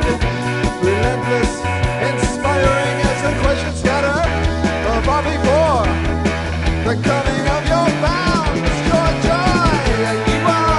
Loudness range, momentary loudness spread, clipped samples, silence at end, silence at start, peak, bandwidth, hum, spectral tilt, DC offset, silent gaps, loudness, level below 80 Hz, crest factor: 1 LU; 4 LU; under 0.1%; 0 s; 0 s; -2 dBFS; 11.5 kHz; none; -5.5 dB/octave; under 0.1%; none; -17 LUFS; -24 dBFS; 14 dB